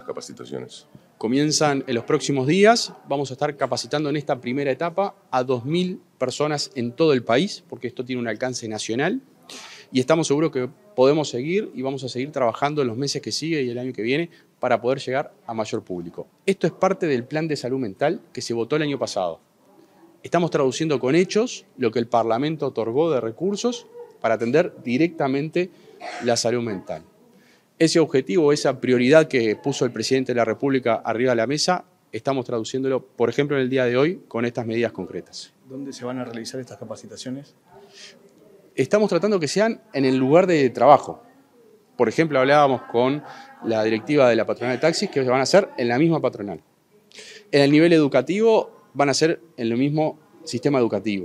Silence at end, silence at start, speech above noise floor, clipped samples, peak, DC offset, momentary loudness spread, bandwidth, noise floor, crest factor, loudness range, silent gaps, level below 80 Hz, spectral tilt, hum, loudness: 0 s; 0.05 s; 34 dB; under 0.1%; 0 dBFS; under 0.1%; 16 LU; 12.5 kHz; -56 dBFS; 22 dB; 6 LU; none; -70 dBFS; -5 dB/octave; none; -22 LUFS